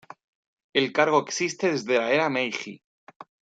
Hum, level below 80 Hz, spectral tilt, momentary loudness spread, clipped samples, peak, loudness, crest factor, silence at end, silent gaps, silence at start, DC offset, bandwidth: none; -74 dBFS; -3.5 dB/octave; 7 LU; under 0.1%; -6 dBFS; -24 LUFS; 22 dB; 0.3 s; 2.84-3.07 s, 3.16-3.20 s; 0.75 s; under 0.1%; 9.2 kHz